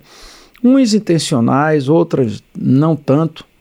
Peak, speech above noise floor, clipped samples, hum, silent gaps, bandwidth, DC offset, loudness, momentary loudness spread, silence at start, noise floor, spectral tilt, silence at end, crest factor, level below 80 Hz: -2 dBFS; 27 dB; under 0.1%; none; none; 13.5 kHz; under 0.1%; -14 LUFS; 6 LU; 0.25 s; -40 dBFS; -6.5 dB/octave; 0.2 s; 12 dB; -52 dBFS